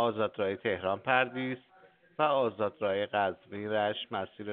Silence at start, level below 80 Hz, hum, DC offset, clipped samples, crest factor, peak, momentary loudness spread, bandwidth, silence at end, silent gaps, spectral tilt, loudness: 0 s; -76 dBFS; none; under 0.1%; under 0.1%; 22 dB; -10 dBFS; 9 LU; 4.5 kHz; 0 s; none; -2.5 dB/octave; -31 LUFS